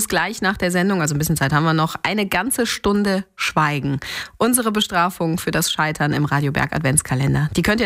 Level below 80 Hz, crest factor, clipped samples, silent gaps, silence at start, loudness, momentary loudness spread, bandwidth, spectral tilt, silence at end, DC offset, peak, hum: -42 dBFS; 18 dB; under 0.1%; none; 0 s; -19 LUFS; 4 LU; 16 kHz; -4.5 dB/octave; 0 s; under 0.1%; -2 dBFS; none